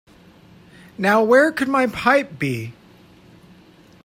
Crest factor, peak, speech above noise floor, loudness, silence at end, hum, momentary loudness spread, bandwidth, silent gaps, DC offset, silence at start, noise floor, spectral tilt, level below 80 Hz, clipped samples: 18 dB; -4 dBFS; 31 dB; -18 LUFS; 1.35 s; none; 11 LU; 16 kHz; none; under 0.1%; 1 s; -49 dBFS; -5.5 dB/octave; -58 dBFS; under 0.1%